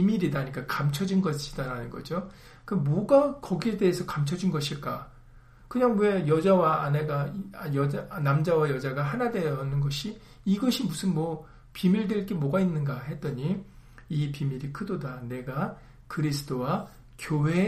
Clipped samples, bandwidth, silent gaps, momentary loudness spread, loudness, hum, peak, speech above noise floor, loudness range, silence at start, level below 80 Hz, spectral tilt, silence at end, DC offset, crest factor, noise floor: under 0.1%; 15 kHz; none; 12 LU; -28 LUFS; none; -8 dBFS; 25 dB; 6 LU; 0 s; -52 dBFS; -7 dB/octave; 0 s; under 0.1%; 20 dB; -52 dBFS